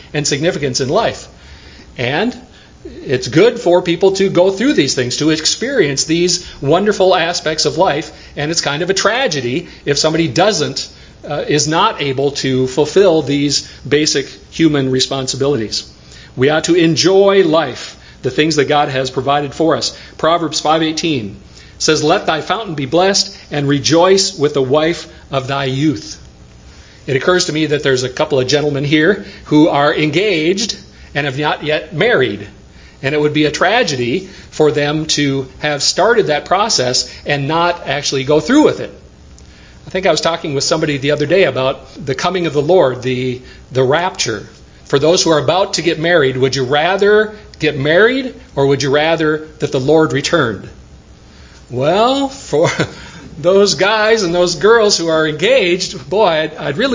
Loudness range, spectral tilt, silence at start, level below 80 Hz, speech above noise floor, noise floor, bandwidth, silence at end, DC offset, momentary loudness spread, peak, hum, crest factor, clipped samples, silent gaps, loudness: 3 LU; -4 dB/octave; 0 s; -44 dBFS; 26 dB; -39 dBFS; 7.8 kHz; 0 s; under 0.1%; 10 LU; 0 dBFS; none; 14 dB; under 0.1%; none; -14 LUFS